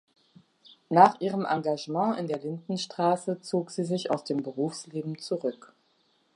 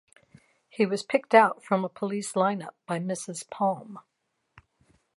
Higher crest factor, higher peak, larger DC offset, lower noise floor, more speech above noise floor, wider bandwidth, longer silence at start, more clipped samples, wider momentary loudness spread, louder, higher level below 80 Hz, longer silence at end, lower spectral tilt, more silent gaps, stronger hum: about the same, 26 dB vs 24 dB; about the same, -4 dBFS vs -4 dBFS; neither; about the same, -69 dBFS vs -67 dBFS; about the same, 41 dB vs 40 dB; about the same, 11.5 kHz vs 11.5 kHz; about the same, 0.9 s vs 0.8 s; neither; second, 13 LU vs 17 LU; about the same, -28 LUFS vs -27 LUFS; second, -82 dBFS vs -76 dBFS; second, 0.8 s vs 1.15 s; about the same, -6 dB/octave vs -5 dB/octave; neither; neither